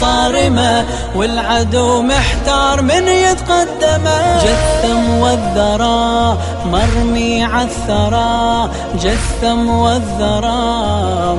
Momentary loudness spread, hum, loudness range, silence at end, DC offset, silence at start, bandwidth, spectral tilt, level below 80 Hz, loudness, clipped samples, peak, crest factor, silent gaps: 4 LU; none; 2 LU; 0 s; 0.7%; 0 s; 11.5 kHz; -4.5 dB/octave; -22 dBFS; -13 LUFS; under 0.1%; 0 dBFS; 12 dB; none